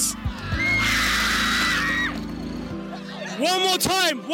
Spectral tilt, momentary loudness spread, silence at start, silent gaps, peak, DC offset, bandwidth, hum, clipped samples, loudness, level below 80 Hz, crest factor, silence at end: -2.5 dB/octave; 13 LU; 0 s; none; -8 dBFS; under 0.1%; 17 kHz; none; under 0.1%; -21 LUFS; -38 dBFS; 16 dB; 0 s